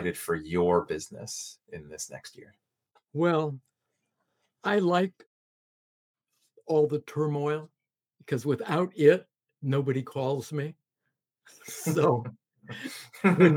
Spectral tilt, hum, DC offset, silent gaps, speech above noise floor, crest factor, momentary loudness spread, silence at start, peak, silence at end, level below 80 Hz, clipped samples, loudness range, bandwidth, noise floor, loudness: -6 dB/octave; none; under 0.1%; 5.26-6.14 s; 56 dB; 22 dB; 17 LU; 0 s; -6 dBFS; 0 s; -66 dBFS; under 0.1%; 5 LU; 17.5 kHz; -83 dBFS; -28 LUFS